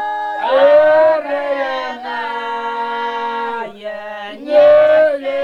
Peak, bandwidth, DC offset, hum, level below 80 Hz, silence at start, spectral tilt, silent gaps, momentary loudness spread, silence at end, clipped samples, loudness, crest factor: -2 dBFS; 6.4 kHz; under 0.1%; none; -60 dBFS; 0 s; -4.5 dB/octave; none; 17 LU; 0 s; under 0.1%; -14 LUFS; 14 dB